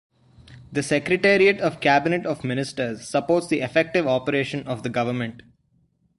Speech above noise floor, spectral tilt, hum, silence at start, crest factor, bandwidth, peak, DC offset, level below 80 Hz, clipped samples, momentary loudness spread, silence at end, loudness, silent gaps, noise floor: 43 dB; -5.5 dB/octave; none; 0.5 s; 20 dB; 11.5 kHz; -4 dBFS; under 0.1%; -58 dBFS; under 0.1%; 11 LU; 0.8 s; -22 LUFS; none; -65 dBFS